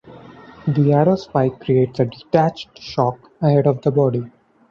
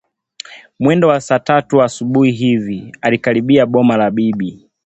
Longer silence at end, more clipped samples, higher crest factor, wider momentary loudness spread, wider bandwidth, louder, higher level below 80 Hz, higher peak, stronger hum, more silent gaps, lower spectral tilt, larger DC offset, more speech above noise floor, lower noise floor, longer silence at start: about the same, 0.4 s vs 0.3 s; neither; about the same, 16 dB vs 14 dB; about the same, 11 LU vs 13 LU; second, 6.8 kHz vs 8.2 kHz; second, -19 LUFS vs -14 LUFS; about the same, -54 dBFS vs -54 dBFS; about the same, -2 dBFS vs 0 dBFS; neither; neither; first, -9 dB/octave vs -6.5 dB/octave; neither; about the same, 24 dB vs 23 dB; first, -41 dBFS vs -37 dBFS; second, 0.05 s vs 0.5 s